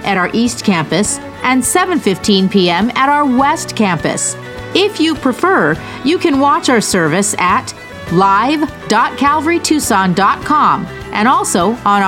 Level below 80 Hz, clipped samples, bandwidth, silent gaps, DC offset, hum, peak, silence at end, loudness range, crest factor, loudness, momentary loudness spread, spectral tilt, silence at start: -42 dBFS; under 0.1%; 17 kHz; none; under 0.1%; none; 0 dBFS; 0 s; 1 LU; 12 dB; -13 LUFS; 6 LU; -4 dB/octave; 0 s